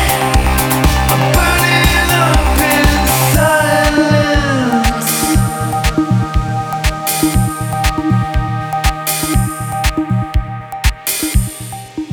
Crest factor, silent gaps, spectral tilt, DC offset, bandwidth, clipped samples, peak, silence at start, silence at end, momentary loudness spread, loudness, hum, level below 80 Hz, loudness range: 14 dB; none; -4.5 dB/octave; under 0.1%; over 20 kHz; under 0.1%; 0 dBFS; 0 s; 0 s; 7 LU; -13 LUFS; none; -20 dBFS; 6 LU